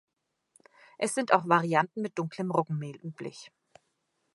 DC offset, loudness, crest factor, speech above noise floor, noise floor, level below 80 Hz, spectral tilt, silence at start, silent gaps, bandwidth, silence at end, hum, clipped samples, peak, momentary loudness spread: under 0.1%; -29 LUFS; 24 dB; 49 dB; -78 dBFS; -80 dBFS; -5.5 dB/octave; 1 s; none; 11.5 kHz; 0.85 s; none; under 0.1%; -6 dBFS; 17 LU